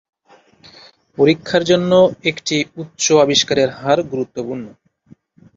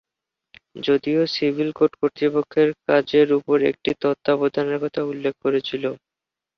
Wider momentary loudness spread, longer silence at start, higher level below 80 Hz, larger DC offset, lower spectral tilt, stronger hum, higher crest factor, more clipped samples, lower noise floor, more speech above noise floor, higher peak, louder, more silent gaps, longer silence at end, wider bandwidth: first, 14 LU vs 7 LU; first, 1.2 s vs 0.75 s; first, -56 dBFS vs -64 dBFS; neither; second, -4 dB/octave vs -7 dB/octave; neither; about the same, 16 dB vs 18 dB; neither; second, -51 dBFS vs -87 dBFS; second, 35 dB vs 66 dB; about the same, -2 dBFS vs -4 dBFS; first, -16 LUFS vs -21 LUFS; neither; first, 0.85 s vs 0.6 s; first, 7.8 kHz vs 6.4 kHz